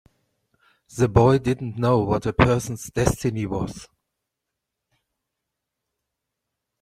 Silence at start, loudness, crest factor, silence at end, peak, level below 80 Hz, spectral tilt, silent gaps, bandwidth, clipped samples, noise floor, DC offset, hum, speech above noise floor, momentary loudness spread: 0.95 s; -22 LUFS; 22 dB; 2.95 s; -2 dBFS; -42 dBFS; -6.5 dB/octave; none; 15 kHz; under 0.1%; -83 dBFS; under 0.1%; none; 62 dB; 12 LU